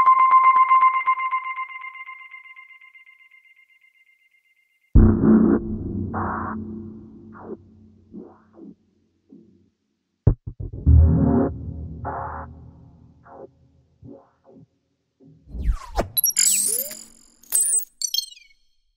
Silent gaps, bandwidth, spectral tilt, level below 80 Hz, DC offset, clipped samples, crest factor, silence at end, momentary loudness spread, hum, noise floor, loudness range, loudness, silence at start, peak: none; 16 kHz; -4.5 dB/octave; -30 dBFS; under 0.1%; under 0.1%; 20 dB; 0.7 s; 25 LU; none; -74 dBFS; 17 LU; -20 LUFS; 0 s; -2 dBFS